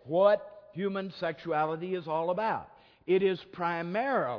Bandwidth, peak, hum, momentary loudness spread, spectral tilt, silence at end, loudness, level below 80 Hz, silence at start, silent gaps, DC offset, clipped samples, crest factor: 5.4 kHz; -12 dBFS; none; 10 LU; -8.5 dB/octave; 0 s; -30 LUFS; -72 dBFS; 0.05 s; none; under 0.1%; under 0.1%; 18 dB